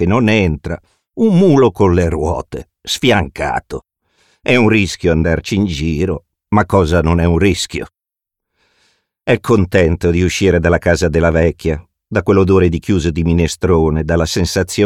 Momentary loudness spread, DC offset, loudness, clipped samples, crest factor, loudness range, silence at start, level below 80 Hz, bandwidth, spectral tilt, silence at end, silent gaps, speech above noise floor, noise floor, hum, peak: 12 LU; under 0.1%; -14 LUFS; under 0.1%; 14 dB; 3 LU; 0 s; -28 dBFS; 15 kHz; -6 dB/octave; 0 s; none; 71 dB; -84 dBFS; none; 0 dBFS